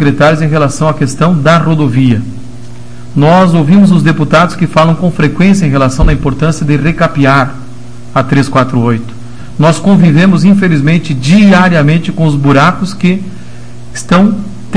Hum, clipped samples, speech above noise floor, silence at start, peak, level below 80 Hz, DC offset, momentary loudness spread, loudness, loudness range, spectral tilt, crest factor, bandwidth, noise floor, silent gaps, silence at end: none; 3%; 22 dB; 0 s; 0 dBFS; -26 dBFS; 8%; 11 LU; -8 LUFS; 3 LU; -7 dB/octave; 8 dB; 10.5 kHz; -29 dBFS; none; 0 s